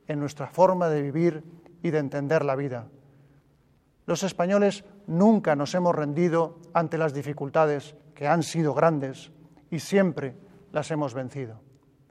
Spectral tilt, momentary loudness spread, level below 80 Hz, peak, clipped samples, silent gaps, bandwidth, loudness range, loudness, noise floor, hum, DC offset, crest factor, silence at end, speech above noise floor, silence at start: -6.5 dB/octave; 14 LU; -68 dBFS; -6 dBFS; under 0.1%; none; 13.5 kHz; 5 LU; -26 LUFS; -63 dBFS; none; under 0.1%; 20 dB; 0.5 s; 38 dB; 0.1 s